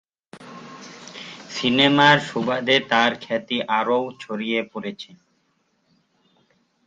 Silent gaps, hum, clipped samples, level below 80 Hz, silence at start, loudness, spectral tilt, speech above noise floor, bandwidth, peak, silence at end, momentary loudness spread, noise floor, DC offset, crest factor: none; none; under 0.1%; -66 dBFS; 0.35 s; -20 LUFS; -4.5 dB/octave; 47 dB; 9.2 kHz; 0 dBFS; 1.8 s; 24 LU; -68 dBFS; under 0.1%; 22 dB